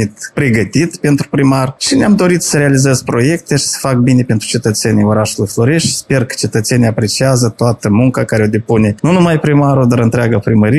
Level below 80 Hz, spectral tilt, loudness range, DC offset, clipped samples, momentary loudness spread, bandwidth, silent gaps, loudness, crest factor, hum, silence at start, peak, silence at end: -42 dBFS; -5.5 dB/octave; 1 LU; under 0.1%; under 0.1%; 4 LU; 14.5 kHz; none; -12 LUFS; 10 dB; none; 0 s; 0 dBFS; 0 s